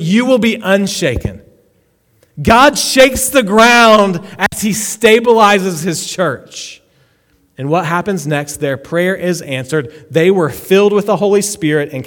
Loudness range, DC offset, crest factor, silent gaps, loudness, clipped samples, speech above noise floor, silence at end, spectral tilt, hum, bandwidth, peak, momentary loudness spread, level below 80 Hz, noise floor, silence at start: 9 LU; under 0.1%; 12 dB; none; -12 LUFS; 0.5%; 44 dB; 0 s; -4 dB/octave; none; 19.5 kHz; 0 dBFS; 11 LU; -38 dBFS; -56 dBFS; 0 s